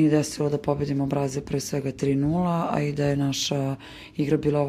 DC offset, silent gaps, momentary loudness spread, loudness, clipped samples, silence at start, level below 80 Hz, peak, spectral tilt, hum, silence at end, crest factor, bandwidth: under 0.1%; none; 6 LU; -25 LUFS; under 0.1%; 0 s; -50 dBFS; -8 dBFS; -6 dB/octave; none; 0 s; 16 dB; 14.5 kHz